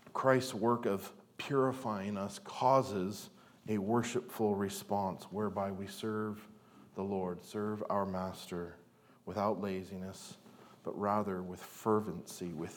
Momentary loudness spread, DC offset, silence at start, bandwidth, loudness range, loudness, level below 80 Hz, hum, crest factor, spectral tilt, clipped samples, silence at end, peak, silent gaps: 16 LU; under 0.1%; 0.05 s; 19 kHz; 5 LU; -36 LUFS; -80 dBFS; none; 22 dB; -6 dB/octave; under 0.1%; 0 s; -14 dBFS; none